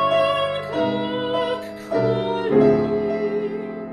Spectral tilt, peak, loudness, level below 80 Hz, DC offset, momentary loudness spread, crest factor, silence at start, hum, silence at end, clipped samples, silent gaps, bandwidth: -7 dB/octave; -4 dBFS; -21 LUFS; -52 dBFS; under 0.1%; 9 LU; 16 dB; 0 s; none; 0 s; under 0.1%; none; 12 kHz